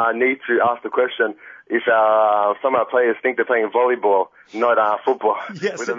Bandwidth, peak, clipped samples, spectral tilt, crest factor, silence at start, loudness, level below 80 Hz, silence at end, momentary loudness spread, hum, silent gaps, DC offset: 7.6 kHz; -6 dBFS; under 0.1%; -4.5 dB/octave; 12 dB; 0 s; -19 LUFS; -72 dBFS; 0 s; 8 LU; none; none; under 0.1%